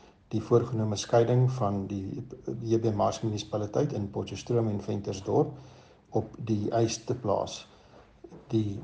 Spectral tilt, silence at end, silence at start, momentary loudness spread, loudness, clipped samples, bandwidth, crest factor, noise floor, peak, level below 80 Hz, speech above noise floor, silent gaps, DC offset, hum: -7 dB/octave; 0 s; 0.3 s; 10 LU; -30 LUFS; under 0.1%; 9 kHz; 20 dB; -55 dBFS; -10 dBFS; -60 dBFS; 27 dB; none; under 0.1%; none